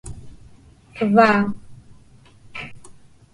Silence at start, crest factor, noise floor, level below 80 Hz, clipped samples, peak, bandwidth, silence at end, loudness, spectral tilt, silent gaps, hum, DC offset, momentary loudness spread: 0.05 s; 20 dB; -49 dBFS; -50 dBFS; under 0.1%; -2 dBFS; 11 kHz; 0.45 s; -17 LUFS; -6.5 dB/octave; none; none; under 0.1%; 26 LU